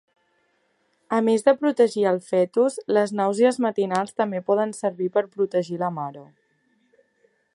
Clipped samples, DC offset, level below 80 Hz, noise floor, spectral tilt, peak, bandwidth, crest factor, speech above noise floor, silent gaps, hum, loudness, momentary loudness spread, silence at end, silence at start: under 0.1%; under 0.1%; -76 dBFS; -68 dBFS; -6 dB/octave; -4 dBFS; 11.5 kHz; 18 dB; 46 dB; none; none; -22 LUFS; 7 LU; 1.3 s; 1.1 s